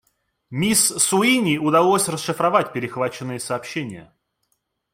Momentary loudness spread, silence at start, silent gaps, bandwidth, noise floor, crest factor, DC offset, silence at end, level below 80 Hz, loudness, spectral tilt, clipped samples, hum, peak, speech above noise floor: 13 LU; 0.5 s; none; 16.5 kHz; -72 dBFS; 18 dB; under 0.1%; 0.9 s; -60 dBFS; -19 LUFS; -3.5 dB/octave; under 0.1%; none; -2 dBFS; 52 dB